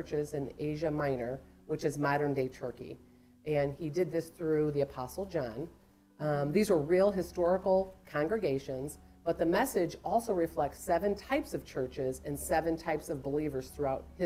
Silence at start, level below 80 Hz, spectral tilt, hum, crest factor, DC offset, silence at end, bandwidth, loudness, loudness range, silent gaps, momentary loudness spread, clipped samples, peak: 0 s; -56 dBFS; -6 dB/octave; none; 16 dB; under 0.1%; 0 s; 16 kHz; -33 LUFS; 4 LU; none; 11 LU; under 0.1%; -16 dBFS